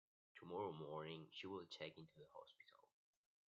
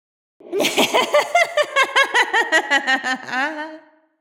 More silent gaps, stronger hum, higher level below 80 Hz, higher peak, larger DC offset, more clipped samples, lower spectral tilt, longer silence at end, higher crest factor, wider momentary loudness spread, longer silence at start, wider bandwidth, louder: neither; neither; second, under -90 dBFS vs -80 dBFS; second, -36 dBFS vs -2 dBFS; neither; neither; first, -3.5 dB/octave vs -1 dB/octave; first, 0.65 s vs 0.4 s; about the same, 20 dB vs 18 dB; first, 17 LU vs 8 LU; about the same, 0.35 s vs 0.45 s; second, 7.2 kHz vs 17.5 kHz; second, -54 LUFS vs -17 LUFS